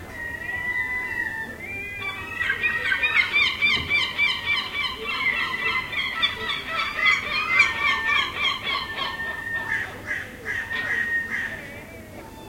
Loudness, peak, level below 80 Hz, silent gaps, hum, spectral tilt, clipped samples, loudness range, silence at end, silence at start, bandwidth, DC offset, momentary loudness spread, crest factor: -23 LUFS; -6 dBFS; -50 dBFS; none; none; -2 dB/octave; under 0.1%; 5 LU; 0 s; 0 s; 16.5 kHz; under 0.1%; 12 LU; 20 dB